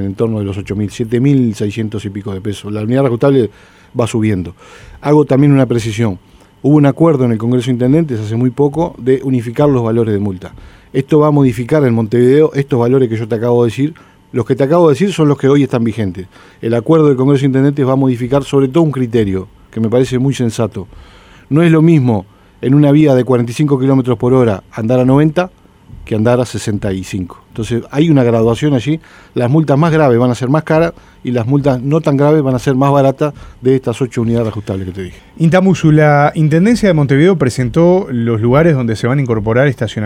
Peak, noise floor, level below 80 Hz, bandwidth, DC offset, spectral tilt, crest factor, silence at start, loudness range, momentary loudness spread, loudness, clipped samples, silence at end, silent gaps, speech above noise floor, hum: 0 dBFS; -35 dBFS; -42 dBFS; 13 kHz; under 0.1%; -8 dB/octave; 12 dB; 0 s; 4 LU; 11 LU; -12 LUFS; under 0.1%; 0 s; none; 24 dB; none